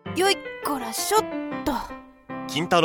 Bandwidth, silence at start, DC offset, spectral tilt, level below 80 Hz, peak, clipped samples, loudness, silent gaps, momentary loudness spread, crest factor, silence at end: over 20 kHz; 0.05 s; under 0.1%; -3 dB/octave; -50 dBFS; -6 dBFS; under 0.1%; -25 LUFS; none; 15 LU; 20 dB; 0 s